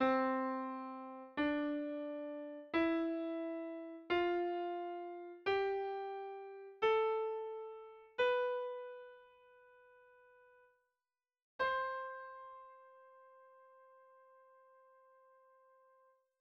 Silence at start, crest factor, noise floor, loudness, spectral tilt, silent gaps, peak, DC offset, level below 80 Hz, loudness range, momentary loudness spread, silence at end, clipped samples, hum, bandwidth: 0 s; 18 dB; under -90 dBFS; -39 LUFS; -5.5 dB/octave; 11.42-11.59 s; -22 dBFS; under 0.1%; -76 dBFS; 8 LU; 16 LU; 2.4 s; under 0.1%; none; 6.6 kHz